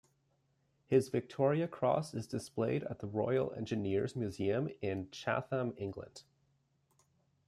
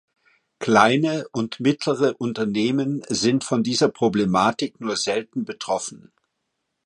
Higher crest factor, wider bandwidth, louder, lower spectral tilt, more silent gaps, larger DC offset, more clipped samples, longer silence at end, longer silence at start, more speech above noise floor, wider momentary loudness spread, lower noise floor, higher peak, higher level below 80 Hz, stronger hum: about the same, 20 dB vs 22 dB; first, 13 kHz vs 11 kHz; second, -36 LUFS vs -22 LUFS; first, -7 dB/octave vs -4.5 dB/octave; neither; neither; neither; first, 1.25 s vs 0.9 s; first, 0.9 s vs 0.6 s; second, 41 dB vs 55 dB; about the same, 8 LU vs 10 LU; about the same, -76 dBFS vs -77 dBFS; second, -16 dBFS vs 0 dBFS; second, -72 dBFS vs -60 dBFS; neither